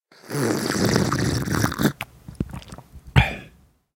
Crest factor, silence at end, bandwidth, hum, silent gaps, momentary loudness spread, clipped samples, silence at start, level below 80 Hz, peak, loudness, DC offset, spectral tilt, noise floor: 22 dB; 0.45 s; 17 kHz; none; none; 17 LU; under 0.1%; 0.25 s; -36 dBFS; -2 dBFS; -23 LUFS; under 0.1%; -5 dB/octave; -53 dBFS